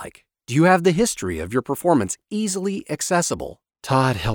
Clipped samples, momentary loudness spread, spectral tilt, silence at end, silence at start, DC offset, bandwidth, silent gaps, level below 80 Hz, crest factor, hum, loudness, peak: under 0.1%; 11 LU; -5 dB/octave; 0 s; 0 s; under 0.1%; over 20 kHz; none; -46 dBFS; 18 dB; none; -21 LUFS; -2 dBFS